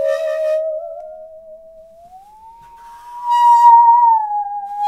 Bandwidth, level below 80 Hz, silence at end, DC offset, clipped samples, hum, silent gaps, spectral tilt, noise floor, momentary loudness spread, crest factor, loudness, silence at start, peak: 11 kHz; -60 dBFS; 0 s; 0.1%; under 0.1%; none; none; -0.5 dB/octave; -42 dBFS; 24 LU; 14 dB; -12 LUFS; 0 s; 0 dBFS